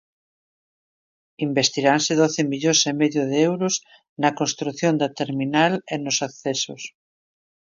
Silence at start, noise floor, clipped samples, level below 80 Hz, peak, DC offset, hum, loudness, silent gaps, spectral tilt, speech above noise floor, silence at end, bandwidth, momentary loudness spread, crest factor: 1.4 s; under -90 dBFS; under 0.1%; -70 dBFS; -2 dBFS; under 0.1%; none; -21 LUFS; 4.09-4.16 s; -3.5 dB/octave; over 69 dB; 0.85 s; 7.6 kHz; 8 LU; 20 dB